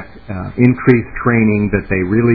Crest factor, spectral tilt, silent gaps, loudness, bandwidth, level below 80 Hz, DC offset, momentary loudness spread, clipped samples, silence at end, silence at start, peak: 14 dB; -12 dB/octave; none; -14 LUFS; 4.8 kHz; -34 dBFS; 0.9%; 12 LU; 0.1%; 0 s; 0 s; 0 dBFS